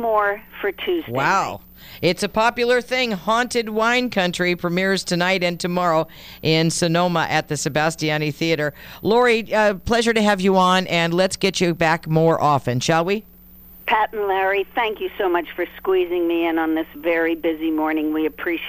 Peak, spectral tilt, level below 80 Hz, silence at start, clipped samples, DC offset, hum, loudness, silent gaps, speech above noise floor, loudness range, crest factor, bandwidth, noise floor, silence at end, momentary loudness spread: -2 dBFS; -4.5 dB/octave; -48 dBFS; 0 s; under 0.1%; under 0.1%; none; -20 LUFS; none; 25 dB; 4 LU; 18 dB; 15.5 kHz; -44 dBFS; 0 s; 6 LU